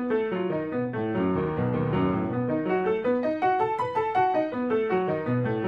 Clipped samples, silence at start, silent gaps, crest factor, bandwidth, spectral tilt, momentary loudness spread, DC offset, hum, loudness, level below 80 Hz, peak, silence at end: under 0.1%; 0 s; none; 12 dB; 7.8 kHz; -9.5 dB/octave; 4 LU; under 0.1%; none; -26 LUFS; -56 dBFS; -12 dBFS; 0 s